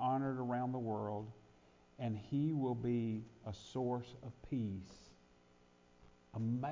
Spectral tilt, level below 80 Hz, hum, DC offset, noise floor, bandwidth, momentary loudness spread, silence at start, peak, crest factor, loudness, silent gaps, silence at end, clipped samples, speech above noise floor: -8.5 dB/octave; -66 dBFS; none; under 0.1%; -68 dBFS; 7.6 kHz; 14 LU; 0 s; -26 dBFS; 14 dB; -41 LUFS; none; 0 s; under 0.1%; 28 dB